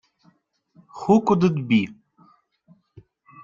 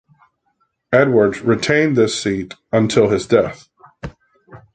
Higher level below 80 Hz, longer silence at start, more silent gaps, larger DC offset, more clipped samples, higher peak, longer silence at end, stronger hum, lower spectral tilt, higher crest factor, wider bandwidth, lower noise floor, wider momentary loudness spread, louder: second, -62 dBFS vs -48 dBFS; about the same, 0.95 s vs 0.9 s; neither; neither; neither; about the same, -4 dBFS vs -2 dBFS; first, 1.5 s vs 0.15 s; neither; first, -7.5 dB/octave vs -5.5 dB/octave; about the same, 20 dB vs 16 dB; second, 7.4 kHz vs 9.4 kHz; second, -62 dBFS vs -66 dBFS; second, 13 LU vs 19 LU; second, -21 LUFS vs -16 LUFS